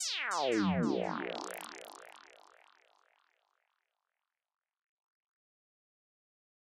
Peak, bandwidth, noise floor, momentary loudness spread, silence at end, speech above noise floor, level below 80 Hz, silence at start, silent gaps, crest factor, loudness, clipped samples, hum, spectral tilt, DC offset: -20 dBFS; 15.5 kHz; under -90 dBFS; 22 LU; 4.25 s; over 57 dB; -76 dBFS; 0 s; none; 20 dB; -34 LUFS; under 0.1%; none; -4 dB/octave; under 0.1%